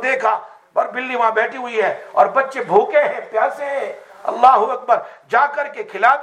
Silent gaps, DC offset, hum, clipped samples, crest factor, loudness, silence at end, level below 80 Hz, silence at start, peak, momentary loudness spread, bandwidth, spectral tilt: none; under 0.1%; none; under 0.1%; 16 dB; -18 LUFS; 0 s; -70 dBFS; 0 s; 0 dBFS; 11 LU; 10 kHz; -4 dB/octave